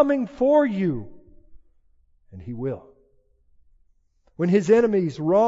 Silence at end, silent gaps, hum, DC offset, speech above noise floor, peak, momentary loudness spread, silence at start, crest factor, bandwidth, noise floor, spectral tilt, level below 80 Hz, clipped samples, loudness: 0 s; none; none; under 0.1%; 41 dB; -6 dBFS; 17 LU; 0 s; 18 dB; 7.8 kHz; -62 dBFS; -8 dB/octave; -54 dBFS; under 0.1%; -22 LUFS